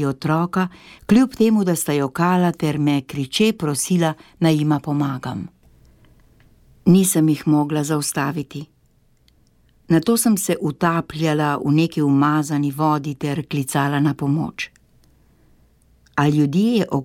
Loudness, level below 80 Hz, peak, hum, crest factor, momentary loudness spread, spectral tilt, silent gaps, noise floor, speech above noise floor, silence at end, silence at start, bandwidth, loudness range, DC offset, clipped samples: -19 LUFS; -54 dBFS; -4 dBFS; none; 16 dB; 8 LU; -5.5 dB/octave; none; -58 dBFS; 39 dB; 0 s; 0 s; 17.5 kHz; 4 LU; under 0.1%; under 0.1%